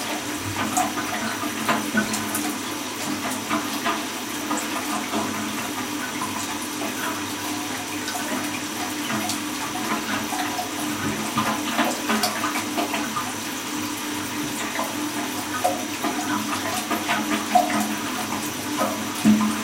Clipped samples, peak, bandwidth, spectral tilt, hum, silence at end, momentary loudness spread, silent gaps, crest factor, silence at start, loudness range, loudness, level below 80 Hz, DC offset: under 0.1%; -4 dBFS; 16.5 kHz; -2.5 dB/octave; none; 0 s; 5 LU; none; 22 dB; 0 s; 3 LU; -25 LUFS; -60 dBFS; under 0.1%